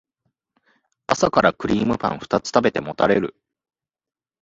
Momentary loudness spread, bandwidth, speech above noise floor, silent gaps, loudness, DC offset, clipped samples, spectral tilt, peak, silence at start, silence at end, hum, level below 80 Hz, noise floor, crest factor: 7 LU; 8 kHz; 55 dB; none; -20 LUFS; under 0.1%; under 0.1%; -5 dB/octave; 0 dBFS; 1.1 s; 1.1 s; none; -52 dBFS; -75 dBFS; 22 dB